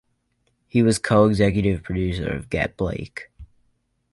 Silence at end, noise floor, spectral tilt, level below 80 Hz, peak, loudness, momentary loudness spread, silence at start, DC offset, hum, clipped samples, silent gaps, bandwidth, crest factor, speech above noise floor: 0.65 s; -69 dBFS; -6.5 dB/octave; -40 dBFS; -4 dBFS; -21 LUFS; 11 LU; 0.75 s; under 0.1%; none; under 0.1%; none; 11.5 kHz; 18 dB; 49 dB